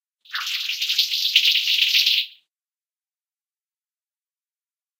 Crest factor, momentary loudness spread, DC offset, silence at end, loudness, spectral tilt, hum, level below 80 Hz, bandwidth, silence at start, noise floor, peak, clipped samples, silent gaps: 24 dB; 12 LU; under 0.1%; 2.7 s; -18 LUFS; 8 dB/octave; none; under -90 dBFS; 16.5 kHz; 0.3 s; under -90 dBFS; 0 dBFS; under 0.1%; none